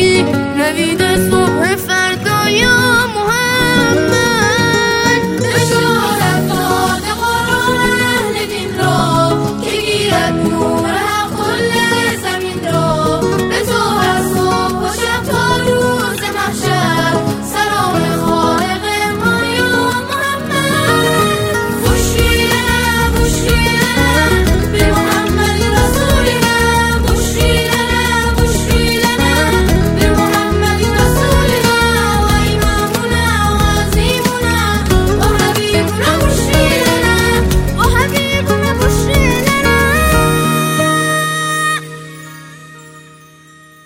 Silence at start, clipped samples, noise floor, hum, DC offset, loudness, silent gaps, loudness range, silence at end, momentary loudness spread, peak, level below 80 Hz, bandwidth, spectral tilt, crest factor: 0 s; under 0.1%; -41 dBFS; none; under 0.1%; -12 LUFS; none; 3 LU; 0.85 s; 4 LU; 0 dBFS; -22 dBFS; 16.5 kHz; -4.5 dB/octave; 12 dB